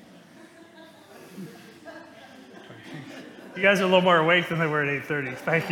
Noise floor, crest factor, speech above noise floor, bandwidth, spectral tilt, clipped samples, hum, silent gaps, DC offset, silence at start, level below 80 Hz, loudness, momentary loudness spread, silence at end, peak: -50 dBFS; 22 dB; 27 dB; 17.5 kHz; -5.5 dB/octave; under 0.1%; none; none; under 0.1%; 0.8 s; -70 dBFS; -22 LUFS; 26 LU; 0 s; -4 dBFS